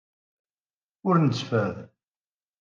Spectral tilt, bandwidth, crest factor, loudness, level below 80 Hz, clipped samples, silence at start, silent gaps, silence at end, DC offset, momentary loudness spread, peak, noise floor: -7.5 dB/octave; 7.4 kHz; 20 dB; -25 LUFS; -72 dBFS; under 0.1%; 1.05 s; none; 0.75 s; under 0.1%; 10 LU; -8 dBFS; under -90 dBFS